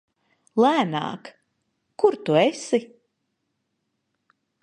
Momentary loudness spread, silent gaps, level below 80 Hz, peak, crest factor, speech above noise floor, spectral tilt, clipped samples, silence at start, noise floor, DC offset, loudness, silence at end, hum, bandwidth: 10 LU; none; -76 dBFS; -6 dBFS; 20 dB; 55 dB; -5.5 dB/octave; under 0.1%; 0.55 s; -76 dBFS; under 0.1%; -22 LUFS; 1.75 s; none; 11 kHz